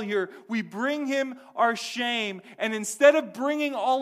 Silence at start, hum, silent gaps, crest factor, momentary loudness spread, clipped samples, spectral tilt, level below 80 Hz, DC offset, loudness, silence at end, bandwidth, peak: 0 s; none; none; 20 dB; 12 LU; under 0.1%; -3 dB/octave; -80 dBFS; under 0.1%; -26 LUFS; 0 s; 15.5 kHz; -6 dBFS